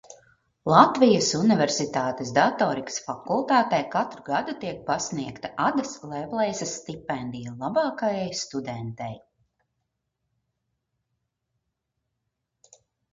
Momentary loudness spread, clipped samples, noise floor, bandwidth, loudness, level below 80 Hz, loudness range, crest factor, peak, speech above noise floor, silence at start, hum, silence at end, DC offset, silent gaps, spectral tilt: 15 LU; under 0.1%; -80 dBFS; 7.6 kHz; -25 LUFS; -64 dBFS; 14 LU; 24 dB; -2 dBFS; 56 dB; 0.1 s; none; 3.95 s; under 0.1%; none; -4.5 dB/octave